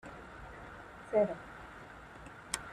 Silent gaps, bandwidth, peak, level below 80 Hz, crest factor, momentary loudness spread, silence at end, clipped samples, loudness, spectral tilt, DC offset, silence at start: none; 13.5 kHz; -12 dBFS; -60 dBFS; 26 dB; 19 LU; 0 s; under 0.1%; -36 LUFS; -4 dB/octave; under 0.1%; 0.05 s